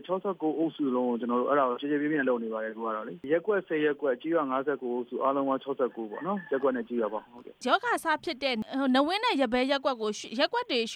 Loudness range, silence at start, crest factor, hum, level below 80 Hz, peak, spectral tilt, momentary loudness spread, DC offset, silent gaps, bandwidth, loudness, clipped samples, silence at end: 2 LU; 0.05 s; 20 dB; none; -70 dBFS; -10 dBFS; -4.5 dB/octave; 7 LU; under 0.1%; none; 14 kHz; -29 LUFS; under 0.1%; 0 s